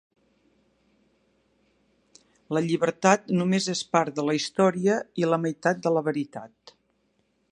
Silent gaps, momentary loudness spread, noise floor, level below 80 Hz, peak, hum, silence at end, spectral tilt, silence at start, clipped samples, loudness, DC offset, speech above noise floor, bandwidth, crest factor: none; 7 LU; -70 dBFS; -72 dBFS; -4 dBFS; none; 1.05 s; -5 dB/octave; 2.5 s; under 0.1%; -25 LUFS; under 0.1%; 46 dB; 11 kHz; 24 dB